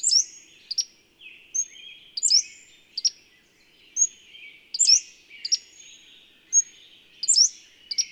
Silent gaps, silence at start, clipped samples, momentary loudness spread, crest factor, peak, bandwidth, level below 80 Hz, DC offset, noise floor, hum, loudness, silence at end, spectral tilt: none; 0.05 s; under 0.1%; 18 LU; 20 dB; -6 dBFS; 15.5 kHz; -78 dBFS; under 0.1%; -59 dBFS; none; -22 LUFS; 0.05 s; 5.5 dB/octave